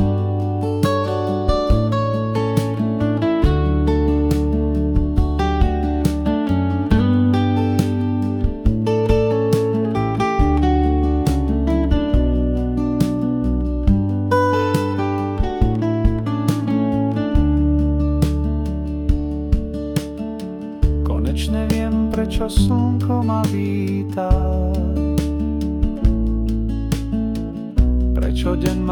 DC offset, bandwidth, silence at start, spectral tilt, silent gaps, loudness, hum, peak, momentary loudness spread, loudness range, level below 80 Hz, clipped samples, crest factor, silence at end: under 0.1%; 18 kHz; 0 s; -8 dB/octave; none; -19 LUFS; none; -4 dBFS; 5 LU; 3 LU; -24 dBFS; under 0.1%; 14 dB; 0 s